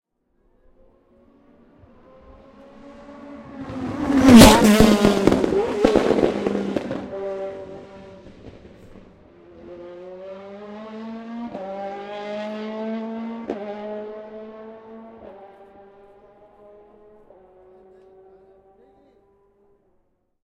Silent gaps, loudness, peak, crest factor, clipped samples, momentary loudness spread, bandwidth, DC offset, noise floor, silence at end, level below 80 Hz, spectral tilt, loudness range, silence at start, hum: none; -18 LUFS; 0 dBFS; 22 dB; under 0.1%; 27 LU; 16 kHz; under 0.1%; -66 dBFS; 5 s; -38 dBFS; -5 dB/octave; 24 LU; 2.85 s; none